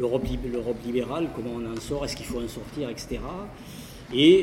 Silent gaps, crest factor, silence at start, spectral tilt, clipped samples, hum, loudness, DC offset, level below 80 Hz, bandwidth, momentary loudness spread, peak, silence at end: none; 20 dB; 0 s; -5.5 dB/octave; under 0.1%; none; -28 LUFS; under 0.1%; -42 dBFS; 16.5 kHz; 11 LU; -6 dBFS; 0 s